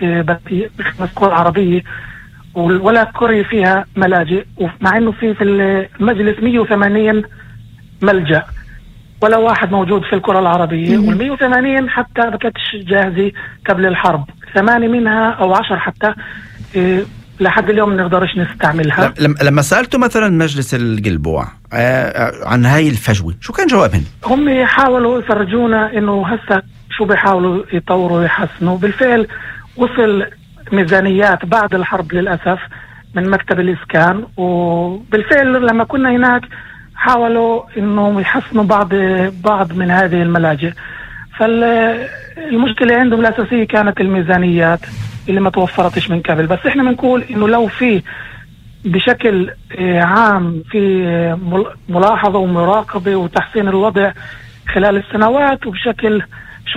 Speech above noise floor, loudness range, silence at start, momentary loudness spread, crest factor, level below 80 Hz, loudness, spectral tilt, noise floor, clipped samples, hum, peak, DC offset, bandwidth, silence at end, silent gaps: 24 dB; 2 LU; 0 s; 8 LU; 14 dB; -38 dBFS; -13 LUFS; -6.5 dB/octave; -36 dBFS; under 0.1%; none; 0 dBFS; under 0.1%; 15.5 kHz; 0 s; none